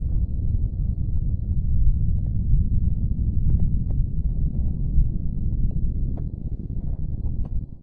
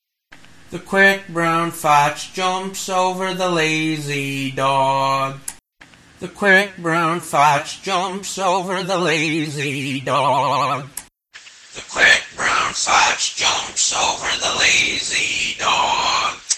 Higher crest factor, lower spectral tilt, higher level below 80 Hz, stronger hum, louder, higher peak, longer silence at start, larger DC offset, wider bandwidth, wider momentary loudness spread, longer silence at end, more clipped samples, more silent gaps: about the same, 14 dB vs 18 dB; first, -15 dB/octave vs -2.5 dB/octave; first, -24 dBFS vs -52 dBFS; neither; second, -26 LUFS vs -17 LUFS; second, -6 dBFS vs 0 dBFS; second, 0 s vs 0.3 s; neither; second, 1 kHz vs 15 kHz; about the same, 7 LU vs 9 LU; about the same, 0 s vs 0 s; neither; neither